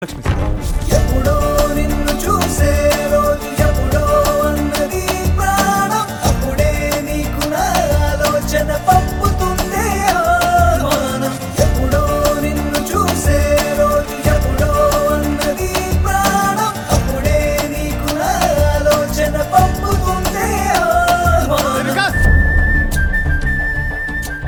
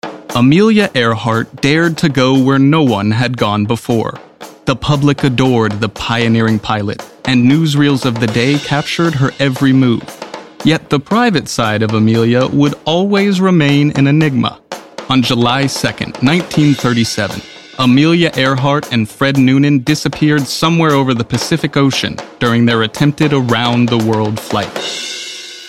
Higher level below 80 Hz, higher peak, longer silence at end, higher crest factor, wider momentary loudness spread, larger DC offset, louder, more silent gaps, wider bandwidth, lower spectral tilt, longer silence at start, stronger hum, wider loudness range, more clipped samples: first, -22 dBFS vs -44 dBFS; about the same, 0 dBFS vs 0 dBFS; about the same, 0 s vs 0 s; about the same, 14 dB vs 12 dB; second, 5 LU vs 8 LU; second, under 0.1% vs 0.2%; about the same, -15 LUFS vs -13 LUFS; neither; first, 19.5 kHz vs 15.5 kHz; about the same, -5 dB/octave vs -6 dB/octave; about the same, 0 s vs 0.05 s; neither; about the same, 2 LU vs 2 LU; neither